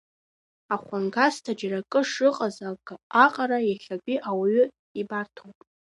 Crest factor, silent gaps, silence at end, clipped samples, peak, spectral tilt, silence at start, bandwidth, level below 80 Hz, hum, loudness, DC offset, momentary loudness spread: 22 dB; 3.03-3.10 s, 4.79-4.95 s; 0.35 s; under 0.1%; -4 dBFS; -5 dB/octave; 0.7 s; 11.5 kHz; -76 dBFS; none; -25 LUFS; under 0.1%; 13 LU